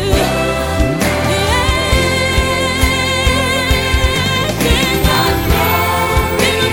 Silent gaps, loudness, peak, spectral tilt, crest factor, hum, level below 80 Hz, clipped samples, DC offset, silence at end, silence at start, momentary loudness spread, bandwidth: none; -13 LUFS; 0 dBFS; -4 dB/octave; 14 dB; none; -20 dBFS; under 0.1%; under 0.1%; 0 s; 0 s; 2 LU; 17 kHz